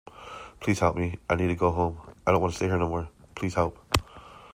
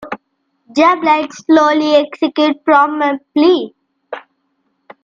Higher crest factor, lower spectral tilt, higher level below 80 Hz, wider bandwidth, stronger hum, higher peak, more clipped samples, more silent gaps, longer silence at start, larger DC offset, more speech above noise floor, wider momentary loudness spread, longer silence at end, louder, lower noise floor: first, 24 dB vs 14 dB; first, -6 dB/octave vs -4 dB/octave; first, -46 dBFS vs -62 dBFS; first, 16 kHz vs 7.6 kHz; neither; about the same, -2 dBFS vs 0 dBFS; neither; neither; first, 0.15 s vs 0 s; neither; second, 22 dB vs 53 dB; about the same, 17 LU vs 19 LU; second, 0.05 s vs 0.85 s; second, -27 LUFS vs -13 LUFS; second, -48 dBFS vs -65 dBFS